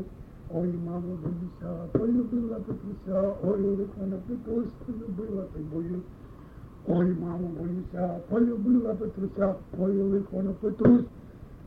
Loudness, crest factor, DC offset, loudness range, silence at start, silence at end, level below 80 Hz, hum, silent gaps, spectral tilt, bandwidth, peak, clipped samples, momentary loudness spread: -29 LUFS; 22 dB; under 0.1%; 6 LU; 0 s; 0 s; -50 dBFS; none; none; -11.5 dB/octave; 3.8 kHz; -8 dBFS; under 0.1%; 13 LU